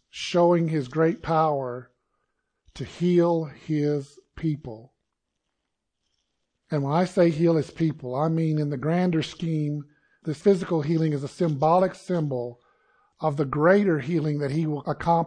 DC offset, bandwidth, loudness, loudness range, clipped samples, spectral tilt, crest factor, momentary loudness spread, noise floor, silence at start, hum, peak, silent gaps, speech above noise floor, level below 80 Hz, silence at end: under 0.1%; 9.8 kHz; -24 LUFS; 4 LU; under 0.1%; -7.5 dB/octave; 18 dB; 11 LU; -80 dBFS; 0.15 s; none; -6 dBFS; none; 57 dB; -58 dBFS; 0 s